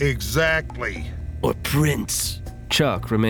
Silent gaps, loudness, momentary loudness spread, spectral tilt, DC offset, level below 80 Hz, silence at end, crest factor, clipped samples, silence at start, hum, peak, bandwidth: none; -22 LUFS; 9 LU; -4.5 dB/octave; under 0.1%; -34 dBFS; 0 s; 16 dB; under 0.1%; 0 s; none; -6 dBFS; 19.5 kHz